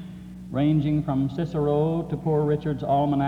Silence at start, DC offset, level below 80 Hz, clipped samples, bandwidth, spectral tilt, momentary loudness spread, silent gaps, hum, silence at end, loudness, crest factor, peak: 0 s; under 0.1%; -48 dBFS; under 0.1%; 5.2 kHz; -9.5 dB/octave; 6 LU; none; none; 0 s; -24 LUFS; 12 dB; -12 dBFS